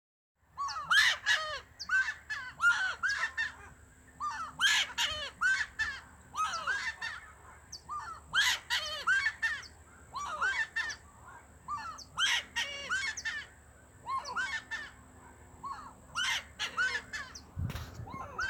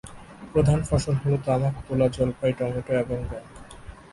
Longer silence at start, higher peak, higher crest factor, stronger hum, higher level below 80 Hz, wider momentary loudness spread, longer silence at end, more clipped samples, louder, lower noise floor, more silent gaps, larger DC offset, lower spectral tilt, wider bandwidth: first, 0.55 s vs 0.05 s; second, -14 dBFS vs -8 dBFS; about the same, 22 dB vs 18 dB; neither; second, -60 dBFS vs -40 dBFS; second, 18 LU vs 22 LU; second, 0 s vs 0.15 s; neither; second, -32 LUFS vs -25 LUFS; first, -57 dBFS vs -43 dBFS; neither; neither; second, -0.5 dB/octave vs -7.5 dB/octave; first, over 20 kHz vs 11.5 kHz